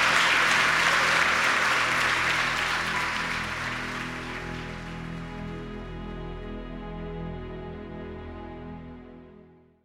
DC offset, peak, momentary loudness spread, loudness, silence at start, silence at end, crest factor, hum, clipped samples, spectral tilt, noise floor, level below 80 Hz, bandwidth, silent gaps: under 0.1%; -8 dBFS; 19 LU; -24 LUFS; 0 s; 0.4 s; 20 dB; none; under 0.1%; -2.5 dB/octave; -53 dBFS; -46 dBFS; 16.5 kHz; none